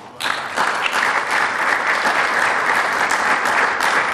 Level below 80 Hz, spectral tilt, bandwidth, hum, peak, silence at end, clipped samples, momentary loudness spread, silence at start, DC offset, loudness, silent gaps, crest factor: -60 dBFS; -1 dB/octave; 15 kHz; none; -4 dBFS; 0 s; under 0.1%; 4 LU; 0 s; under 0.1%; -17 LUFS; none; 14 dB